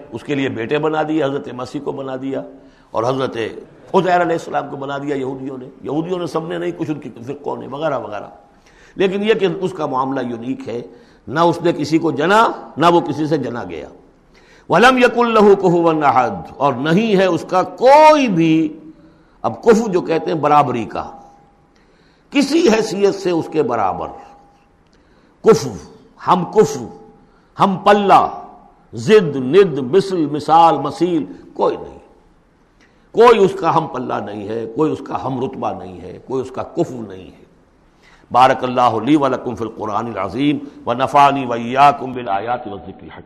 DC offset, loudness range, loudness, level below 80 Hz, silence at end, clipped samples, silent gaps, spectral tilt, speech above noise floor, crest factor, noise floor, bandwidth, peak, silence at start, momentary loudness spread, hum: under 0.1%; 8 LU; -16 LUFS; -52 dBFS; 0.05 s; under 0.1%; none; -6 dB/octave; 37 dB; 16 dB; -53 dBFS; 13.5 kHz; 0 dBFS; 0 s; 16 LU; none